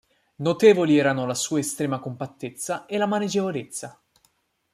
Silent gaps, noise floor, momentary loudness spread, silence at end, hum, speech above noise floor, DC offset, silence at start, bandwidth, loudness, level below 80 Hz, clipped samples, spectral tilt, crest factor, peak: none; -67 dBFS; 16 LU; 0.85 s; none; 44 dB; under 0.1%; 0.4 s; 15.5 kHz; -23 LUFS; -70 dBFS; under 0.1%; -5 dB/octave; 20 dB; -4 dBFS